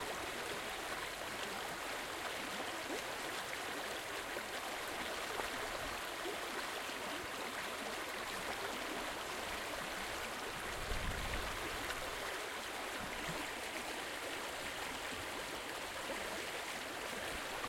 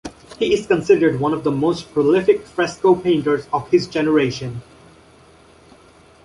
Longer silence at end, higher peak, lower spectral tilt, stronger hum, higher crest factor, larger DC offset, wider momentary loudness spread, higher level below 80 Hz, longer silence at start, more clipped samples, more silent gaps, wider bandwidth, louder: second, 0 s vs 1.65 s; second, -24 dBFS vs -2 dBFS; second, -2 dB/octave vs -6 dB/octave; neither; about the same, 20 dB vs 16 dB; neither; second, 2 LU vs 8 LU; about the same, -56 dBFS vs -52 dBFS; about the same, 0 s vs 0.05 s; neither; neither; first, 16.5 kHz vs 11.5 kHz; second, -41 LUFS vs -18 LUFS